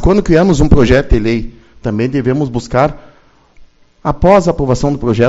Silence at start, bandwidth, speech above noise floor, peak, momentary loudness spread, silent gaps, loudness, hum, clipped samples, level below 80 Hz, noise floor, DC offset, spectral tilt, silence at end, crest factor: 0 s; 8 kHz; 35 dB; 0 dBFS; 11 LU; none; -12 LUFS; none; 0.4%; -22 dBFS; -46 dBFS; under 0.1%; -7 dB/octave; 0 s; 12 dB